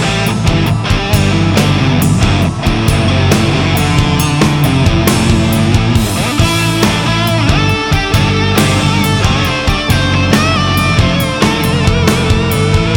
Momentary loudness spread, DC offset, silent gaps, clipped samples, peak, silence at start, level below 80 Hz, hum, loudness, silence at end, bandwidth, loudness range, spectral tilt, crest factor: 2 LU; under 0.1%; none; under 0.1%; 0 dBFS; 0 s; -22 dBFS; none; -11 LUFS; 0 s; 20 kHz; 0 LU; -5 dB/octave; 10 dB